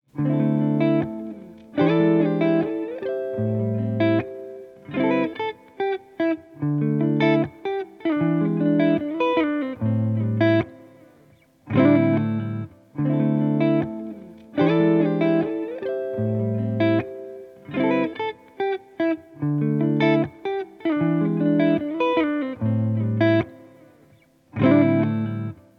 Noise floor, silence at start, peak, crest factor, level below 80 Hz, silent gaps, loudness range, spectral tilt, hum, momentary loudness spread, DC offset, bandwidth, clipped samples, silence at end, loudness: -56 dBFS; 0.15 s; -6 dBFS; 18 dB; -64 dBFS; none; 3 LU; -9.5 dB/octave; none; 12 LU; under 0.1%; 5.6 kHz; under 0.1%; 0.25 s; -22 LUFS